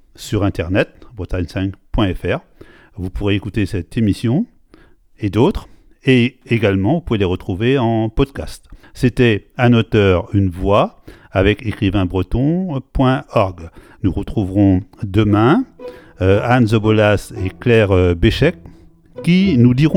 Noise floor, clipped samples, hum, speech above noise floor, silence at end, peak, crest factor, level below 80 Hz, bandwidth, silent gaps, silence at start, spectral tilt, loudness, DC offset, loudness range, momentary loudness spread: -47 dBFS; under 0.1%; none; 32 dB; 0 s; 0 dBFS; 16 dB; -32 dBFS; 13 kHz; none; 0.2 s; -7.5 dB/octave; -16 LUFS; under 0.1%; 6 LU; 10 LU